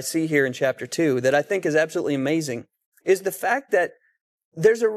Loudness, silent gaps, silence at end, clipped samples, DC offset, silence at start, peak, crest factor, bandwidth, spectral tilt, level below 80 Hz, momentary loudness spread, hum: -22 LUFS; 2.86-2.92 s, 4.21-4.38 s, 4.45-4.52 s; 0 s; under 0.1%; under 0.1%; 0 s; -6 dBFS; 16 dB; 14.5 kHz; -5 dB/octave; -72 dBFS; 5 LU; none